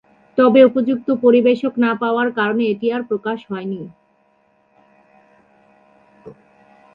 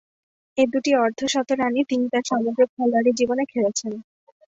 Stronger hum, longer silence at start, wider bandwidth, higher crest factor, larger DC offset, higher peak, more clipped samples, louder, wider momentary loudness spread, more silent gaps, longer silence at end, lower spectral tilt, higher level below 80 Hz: neither; second, 0.35 s vs 0.55 s; second, 5.2 kHz vs 8 kHz; about the same, 18 dB vs 16 dB; neither; first, 0 dBFS vs -6 dBFS; neither; first, -17 LUFS vs -22 LUFS; first, 14 LU vs 6 LU; second, none vs 2.69-2.77 s; first, 0.65 s vs 0.5 s; first, -8.5 dB/octave vs -3.5 dB/octave; about the same, -66 dBFS vs -66 dBFS